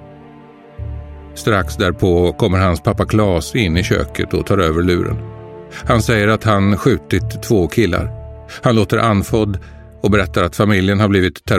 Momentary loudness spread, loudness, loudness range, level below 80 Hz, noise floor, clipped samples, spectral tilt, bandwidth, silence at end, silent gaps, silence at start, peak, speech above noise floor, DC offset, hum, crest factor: 15 LU; -16 LUFS; 1 LU; -32 dBFS; -40 dBFS; under 0.1%; -6.5 dB/octave; 16 kHz; 0 s; none; 0 s; 0 dBFS; 25 dB; under 0.1%; none; 16 dB